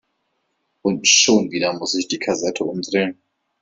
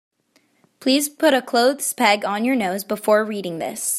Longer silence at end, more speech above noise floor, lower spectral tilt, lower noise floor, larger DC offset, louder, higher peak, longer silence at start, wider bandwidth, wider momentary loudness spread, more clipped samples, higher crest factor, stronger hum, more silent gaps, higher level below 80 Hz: first, 0.5 s vs 0 s; first, 52 dB vs 43 dB; about the same, -2 dB/octave vs -2.5 dB/octave; first, -71 dBFS vs -63 dBFS; neither; about the same, -18 LUFS vs -20 LUFS; about the same, -2 dBFS vs -2 dBFS; about the same, 0.85 s vs 0.8 s; second, 8.4 kHz vs 16 kHz; first, 12 LU vs 9 LU; neither; about the same, 20 dB vs 20 dB; neither; neither; first, -62 dBFS vs -72 dBFS